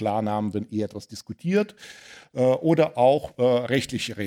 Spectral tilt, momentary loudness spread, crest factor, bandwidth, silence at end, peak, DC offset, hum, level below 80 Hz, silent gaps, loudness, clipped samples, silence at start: -6 dB/octave; 18 LU; 18 dB; 16 kHz; 0 s; -6 dBFS; under 0.1%; none; -60 dBFS; none; -24 LUFS; under 0.1%; 0 s